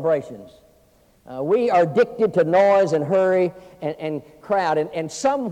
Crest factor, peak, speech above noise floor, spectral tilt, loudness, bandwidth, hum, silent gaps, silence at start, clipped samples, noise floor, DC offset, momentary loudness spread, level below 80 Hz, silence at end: 14 dB; -6 dBFS; 37 dB; -6 dB/octave; -20 LUFS; 10 kHz; none; none; 0 s; under 0.1%; -57 dBFS; under 0.1%; 14 LU; -62 dBFS; 0 s